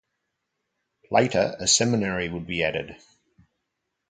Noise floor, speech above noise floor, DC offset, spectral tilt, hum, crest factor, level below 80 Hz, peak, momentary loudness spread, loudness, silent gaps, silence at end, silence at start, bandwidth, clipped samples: -80 dBFS; 56 dB; under 0.1%; -3 dB/octave; none; 22 dB; -54 dBFS; -4 dBFS; 10 LU; -23 LUFS; none; 1.15 s; 1.1 s; 9.6 kHz; under 0.1%